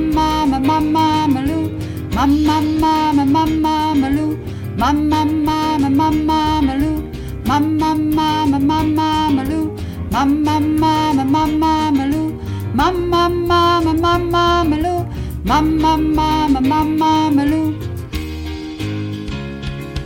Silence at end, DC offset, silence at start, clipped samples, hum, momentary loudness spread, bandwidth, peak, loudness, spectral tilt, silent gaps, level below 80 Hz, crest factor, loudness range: 0 s; under 0.1%; 0 s; under 0.1%; none; 11 LU; 17 kHz; -2 dBFS; -16 LUFS; -6.5 dB/octave; none; -30 dBFS; 12 dB; 1 LU